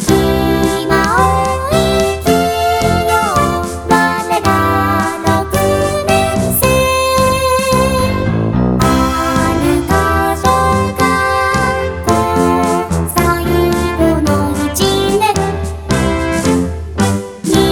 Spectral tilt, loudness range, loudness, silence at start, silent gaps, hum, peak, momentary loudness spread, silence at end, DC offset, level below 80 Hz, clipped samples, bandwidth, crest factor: -5 dB/octave; 1 LU; -13 LUFS; 0 s; none; none; 0 dBFS; 4 LU; 0 s; 0.2%; -26 dBFS; under 0.1%; over 20 kHz; 12 dB